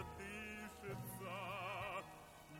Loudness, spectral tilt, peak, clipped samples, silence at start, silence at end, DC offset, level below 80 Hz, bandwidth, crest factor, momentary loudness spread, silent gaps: -48 LUFS; -4.5 dB/octave; -32 dBFS; under 0.1%; 0 s; 0 s; under 0.1%; -66 dBFS; 17 kHz; 16 dB; 5 LU; none